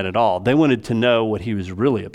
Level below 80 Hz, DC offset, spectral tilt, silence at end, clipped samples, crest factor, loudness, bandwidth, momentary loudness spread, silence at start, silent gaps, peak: -52 dBFS; under 0.1%; -7 dB/octave; 0.05 s; under 0.1%; 14 dB; -19 LUFS; 11.5 kHz; 6 LU; 0 s; none; -4 dBFS